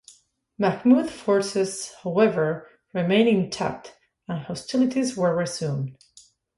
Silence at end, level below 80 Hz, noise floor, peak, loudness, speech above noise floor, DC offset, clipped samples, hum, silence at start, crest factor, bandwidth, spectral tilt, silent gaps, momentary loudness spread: 0.65 s; -62 dBFS; -55 dBFS; -6 dBFS; -24 LUFS; 32 dB; under 0.1%; under 0.1%; none; 0.6 s; 18 dB; 11.5 kHz; -5.5 dB/octave; none; 13 LU